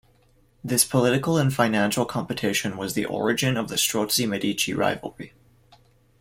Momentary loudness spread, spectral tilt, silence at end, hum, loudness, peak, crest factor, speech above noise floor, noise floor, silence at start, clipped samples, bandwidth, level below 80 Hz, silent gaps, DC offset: 8 LU; -4 dB/octave; 0.9 s; none; -23 LUFS; -4 dBFS; 20 dB; 36 dB; -60 dBFS; 0.65 s; under 0.1%; 16.5 kHz; -58 dBFS; none; under 0.1%